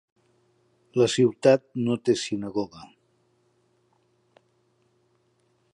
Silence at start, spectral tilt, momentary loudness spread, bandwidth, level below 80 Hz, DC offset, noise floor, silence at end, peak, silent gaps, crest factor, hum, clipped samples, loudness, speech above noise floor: 0.95 s; -5.5 dB/octave; 11 LU; 11 kHz; -68 dBFS; under 0.1%; -68 dBFS; 2.9 s; -4 dBFS; none; 22 dB; none; under 0.1%; -24 LUFS; 45 dB